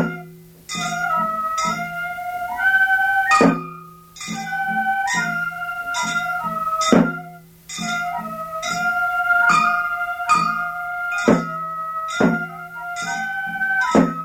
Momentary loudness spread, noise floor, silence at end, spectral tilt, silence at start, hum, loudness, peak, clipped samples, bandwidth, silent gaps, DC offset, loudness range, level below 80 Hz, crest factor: 13 LU; -41 dBFS; 0 s; -4 dB/octave; 0 s; none; -20 LUFS; -2 dBFS; under 0.1%; 19 kHz; none; under 0.1%; 3 LU; -54 dBFS; 20 dB